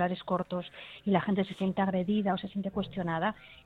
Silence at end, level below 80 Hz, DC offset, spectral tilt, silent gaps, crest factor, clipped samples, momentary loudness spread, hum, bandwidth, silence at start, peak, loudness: 0.1 s; -60 dBFS; under 0.1%; -8.5 dB/octave; none; 18 dB; under 0.1%; 8 LU; none; 4.6 kHz; 0 s; -12 dBFS; -32 LUFS